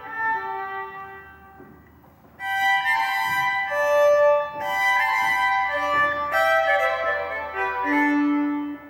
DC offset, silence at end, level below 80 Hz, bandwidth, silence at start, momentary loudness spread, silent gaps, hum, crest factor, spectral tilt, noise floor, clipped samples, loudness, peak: under 0.1%; 0 s; -60 dBFS; 18 kHz; 0 s; 11 LU; none; none; 14 dB; -3.5 dB/octave; -51 dBFS; under 0.1%; -21 LUFS; -8 dBFS